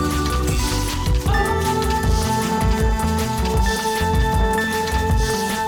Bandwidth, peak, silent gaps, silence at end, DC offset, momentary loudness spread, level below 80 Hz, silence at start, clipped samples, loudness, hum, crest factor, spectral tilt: 18.5 kHz; -6 dBFS; none; 0 s; under 0.1%; 2 LU; -24 dBFS; 0 s; under 0.1%; -20 LUFS; none; 14 dB; -5 dB/octave